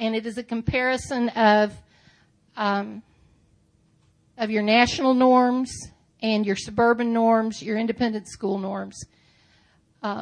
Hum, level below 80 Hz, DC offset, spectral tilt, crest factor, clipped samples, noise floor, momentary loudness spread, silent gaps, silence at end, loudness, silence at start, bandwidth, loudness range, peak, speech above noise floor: none; -52 dBFS; under 0.1%; -5 dB/octave; 20 dB; under 0.1%; -62 dBFS; 15 LU; none; 0 s; -23 LUFS; 0 s; 10.5 kHz; 5 LU; -4 dBFS; 40 dB